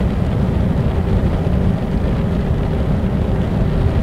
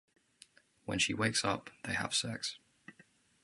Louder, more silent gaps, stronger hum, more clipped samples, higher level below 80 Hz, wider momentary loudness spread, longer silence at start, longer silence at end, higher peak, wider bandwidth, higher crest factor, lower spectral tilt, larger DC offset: first, -18 LUFS vs -34 LUFS; neither; neither; neither; first, -22 dBFS vs -64 dBFS; second, 1 LU vs 10 LU; second, 0 s vs 0.85 s; second, 0 s vs 0.55 s; first, -4 dBFS vs -16 dBFS; about the same, 11 kHz vs 11.5 kHz; second, 12 dB vs 22 dB; first, -9 dB/octave vs -2.5 dB/octave; first, 1% vs under 0.1%